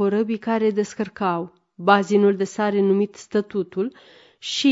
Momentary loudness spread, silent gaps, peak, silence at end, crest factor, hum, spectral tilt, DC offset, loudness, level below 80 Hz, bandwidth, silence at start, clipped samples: 10 LU; none; -2 dBFS; 0 s; 20 dB; none; -5.5 dB/octave; under 0.1%; -22 LUFS; -68 dBFS; 7.8 kHz; 0 s; under 0.1%